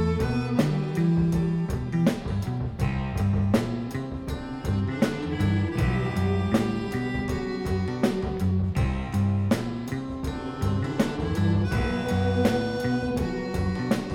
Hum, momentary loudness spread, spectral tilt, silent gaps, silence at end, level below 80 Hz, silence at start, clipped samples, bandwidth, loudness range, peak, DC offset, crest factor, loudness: none; 7 LU; -7.5 dB/octave; none; 0 s; -38 dBFS; 0 s; under 0.1%; 16 kHz; 1 LU; -8 dBFS; under 0.1%; 16 dB; -26 LUFS